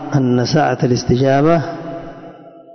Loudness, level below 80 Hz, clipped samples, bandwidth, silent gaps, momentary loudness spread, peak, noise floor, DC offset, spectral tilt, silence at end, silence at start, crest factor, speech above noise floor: -15 LUFS; -44 dBFS; under 0.1%; 6.4 kHz; none; 18 LU; -2 dBFS; -37 dBFS; under 0.1%; -6.5 dB/octave; 0 s; 0 s; 14 dB; 24 dB